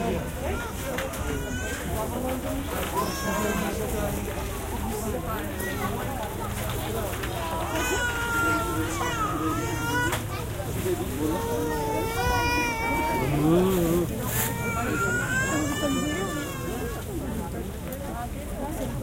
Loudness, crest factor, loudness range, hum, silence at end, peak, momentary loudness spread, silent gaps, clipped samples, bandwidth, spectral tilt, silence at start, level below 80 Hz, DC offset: -28 LUFS; 16 dB; 5 LU; none; 0 s; -10 dBFS; 8 LU; none; under 0.1%; 16.5 kHz; -4.5 dB/octave; 0 s; -38 dBFS; under 0.1%